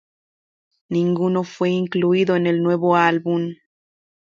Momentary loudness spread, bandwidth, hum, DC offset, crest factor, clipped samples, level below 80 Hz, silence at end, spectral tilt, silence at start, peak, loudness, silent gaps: 7 LU; 7.4 kHz; none; under 0.1%; 18 dB; under 0.1%; -66 dBFS; 0.8 s; -7.5 dB/octave; 0.9 s; -2 dBFS; -19 LUFS; none